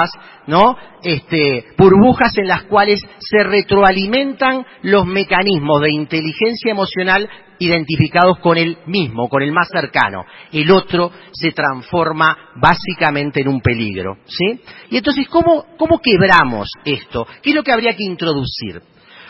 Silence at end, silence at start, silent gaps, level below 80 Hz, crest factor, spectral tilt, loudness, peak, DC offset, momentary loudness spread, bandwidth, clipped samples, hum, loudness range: 0.5 s; 0 s; none; -42 dBFS; 14 dB; -7.5 dB/octave; -14 LUFS; 0 dBFS; under 0.1%; 9 LU; 8 kHz; under 0.1%; none; 4 LU